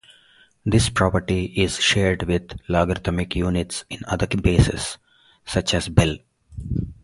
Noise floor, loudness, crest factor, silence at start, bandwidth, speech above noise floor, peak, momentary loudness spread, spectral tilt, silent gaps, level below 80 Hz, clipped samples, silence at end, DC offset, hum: -55 dBFS; -22 LUFS; 22 dB; 0.65 s; 11.5 kHz; 34 dB; 0 dBFS; 12 LU; -5 dB/octave; none; -34 dBFS; under 0.1%; 0.1 s; under 0.1%; none